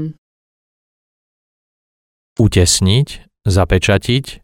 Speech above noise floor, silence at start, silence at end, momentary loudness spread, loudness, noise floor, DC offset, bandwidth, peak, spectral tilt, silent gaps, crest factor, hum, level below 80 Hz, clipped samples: over 77 dB; 0 s; 0.1 s; 12 LU; -14 LUFS; under -90 dBFS; under 0.1%; 16.5 kHz; 0 dBFS; -4.5 dB/octave; 0.18-2.36 s; 16 dB; none; -32 dBFS; under 0.1%